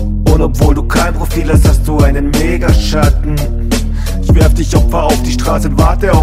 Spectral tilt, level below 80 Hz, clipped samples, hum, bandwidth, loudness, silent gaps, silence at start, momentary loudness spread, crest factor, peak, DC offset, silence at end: -6 dB/octave; -12 dBFS; 0.3%; none; 16 kHz; -12 LUFS; none; 0 s; 6 LU; 10 dB; 0 dBFS; under 0.1%; 0 s